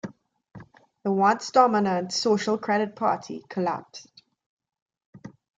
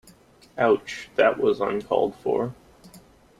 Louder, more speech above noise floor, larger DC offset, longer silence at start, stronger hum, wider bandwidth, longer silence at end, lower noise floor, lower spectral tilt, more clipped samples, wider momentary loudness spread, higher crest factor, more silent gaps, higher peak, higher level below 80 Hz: about the same, -24 LUFS vs -24 LUFS; second, 25 dB vs 30 dB; neither; second, 0.05 s vs 0.55 s; neither; second, 9.2 kHz vs 12.5 kHz; about the same, 0.3 s vs 0.4 s; second, -48 dBFS vs -53 dBFS; about the same, -5 dB/octave vs -5.5 dB/octave; neither; first, 15 LU vs 9 LU; about the same, 20 dB vs 18 dB; first, 4.46-4.57 s, 4.82-4.86 s, 5.06-5.13 s vs none; about the same, -6 dBFS vs -6 dBFS; second, -72 dBFS vs -60 dBFS